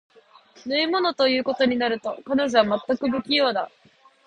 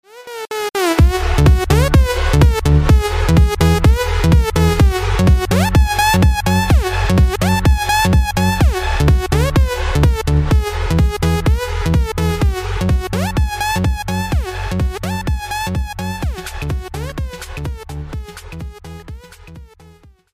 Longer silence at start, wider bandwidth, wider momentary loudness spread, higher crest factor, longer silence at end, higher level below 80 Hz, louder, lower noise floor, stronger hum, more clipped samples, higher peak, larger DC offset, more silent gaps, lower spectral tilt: first, 0.65 s vs 0.15 s; second, 9.4 kHz vs 15.5 kHz; second, 8 LU vs 14 LU; first, 22 dB vs 14 dB; about the same, 0.6 s vs 0.7 s; second, -62 dBFS vs -18 dBFS; second, -22 LUFS vs -15 LUFS; first, -53 dBFS vs -45 dBFS; neither; neither; about the same, -2 dBFS vs -2 dBFS; neither; neither; second, -4.5 dB/octave vs -6 dB/octave